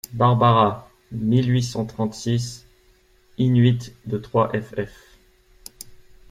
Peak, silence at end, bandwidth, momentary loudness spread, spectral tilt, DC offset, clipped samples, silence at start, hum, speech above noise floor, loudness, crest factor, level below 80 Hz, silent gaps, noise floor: -2 dBFS; 0.35 s; 15.5 kHz; 23 LU; -7 dB/octave; under 0.1%; under 0.1%; 0.1 s; none; 37 dB; -21 LUFS; 20 dB; -52 dBFS; none; -57 dBFS